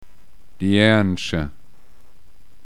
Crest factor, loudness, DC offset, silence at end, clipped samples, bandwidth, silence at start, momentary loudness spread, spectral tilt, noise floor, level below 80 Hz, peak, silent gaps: 22 dB; -19 LUFS; 2%; 1.15 s; under 0.1%; 12 kHz; 0.6 s; 12 LU; -6 dB/octave; -54 dBFS; -44 dBFS; 0 dBFS; none